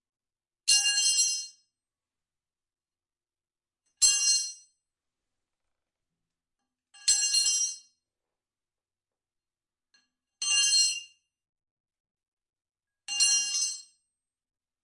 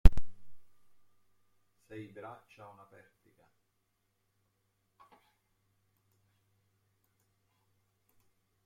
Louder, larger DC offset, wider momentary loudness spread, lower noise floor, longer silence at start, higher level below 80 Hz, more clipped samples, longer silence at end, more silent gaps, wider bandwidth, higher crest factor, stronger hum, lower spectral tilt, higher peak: first, -24 LUFS vs -40 LUFS; neither; second, 14 LU vs 18 LU; first, under -90 dBFS vs -80 dBFS; first, 0.65 s vs 0.05 s; second, -74 dBFS vs -38 dBFS; neither; second, 1 s vs 8.1 s; first, 11.49-11.53 s, 11.71-11.84 s, 12.00-12.04 s, 12.11-12.15 s, 12.28-12.37 s vs none; first, 11.5 kHz vs 4.9 kHz; about the same, 24 dB vs 28 dB; neither; second, 6 dB/octave vs -7.5 dB/octave; second, -8 dBFS vs -4 dBFS